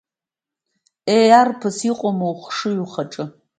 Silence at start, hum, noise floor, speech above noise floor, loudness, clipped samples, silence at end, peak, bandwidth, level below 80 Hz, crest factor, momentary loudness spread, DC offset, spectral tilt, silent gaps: 1.05 s; none; -89 dBFS; 71 dB; -18 LUFS; under 0.1%; 0.3 s; 0 dBFS; 9.4 kHz; -70 dBFS; 18 dB; 16 LU; under 0.1%; -5 dB/octave; none